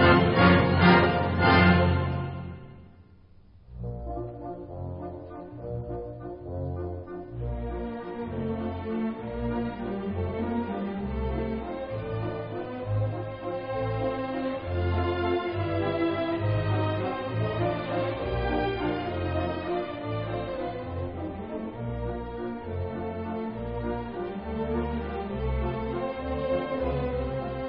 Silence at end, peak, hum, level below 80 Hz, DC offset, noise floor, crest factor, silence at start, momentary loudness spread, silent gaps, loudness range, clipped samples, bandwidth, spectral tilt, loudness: 0 s; -4 dBFS; none; -42 dBFS; under 0.1%; -53 dBFS; 24 dB; 0 s; 15 LU; none; 10 LU; under 0.1%; 5.4 kHz; -11 dB/octave; -29 LUFS